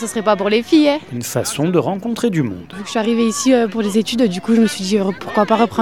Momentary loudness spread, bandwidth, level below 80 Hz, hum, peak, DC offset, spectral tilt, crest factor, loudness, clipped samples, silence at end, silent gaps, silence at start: 7 LU; 17.5 kHz; -54 dBFS; none; 0 dBFS; 0.4%; -5 dB/octave; 16 dB; -17 LUFS; under 0.1%; 0 s; none; 0 s